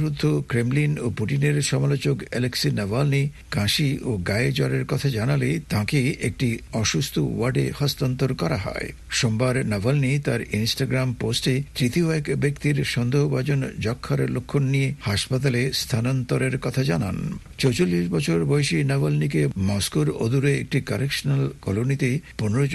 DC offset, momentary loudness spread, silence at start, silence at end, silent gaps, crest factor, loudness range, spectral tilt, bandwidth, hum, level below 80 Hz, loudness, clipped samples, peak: under 0.1%; 4 LU; 0 s; 0 s; none; 16 dB; 1 LU; -5.5 dB/octave; 12.5 kHz; none; -46 dBFS; -23 LUFS; under 0.1%; -8 dBFS